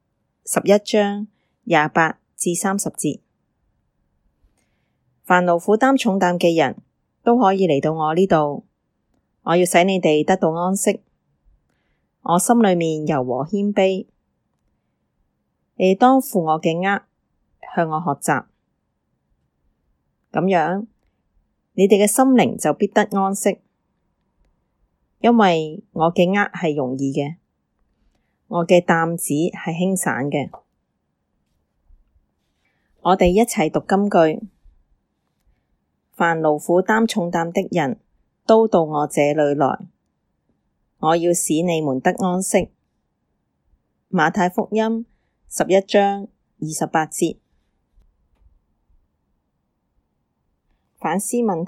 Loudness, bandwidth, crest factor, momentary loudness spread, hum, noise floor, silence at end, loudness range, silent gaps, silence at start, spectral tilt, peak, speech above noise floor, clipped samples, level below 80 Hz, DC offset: -19 LUFS; 16.5 kHz; 20 dB; 12 LU; none; -72 dBFS; 0 s; 7 LU; none; 0.45 s; -5 dB/octave; 0 dBFS; 54 dB; under 0.1%; -54 dBFS; under 0.1%